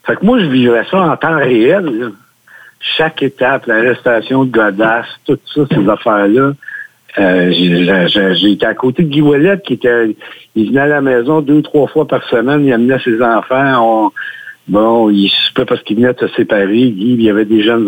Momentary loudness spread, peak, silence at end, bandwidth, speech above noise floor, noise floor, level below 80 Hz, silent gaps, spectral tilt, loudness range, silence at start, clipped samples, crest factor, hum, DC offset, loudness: 7 LU; 0 dBFS; 0 s; 17 kHz; 30 dB; -40 dBFS; -50 dBFS; none; -7.5 dB/octave; 2 LU; 0.05 s; under 0.1%; 10 dB; none; under 0.1%; -11 LUFS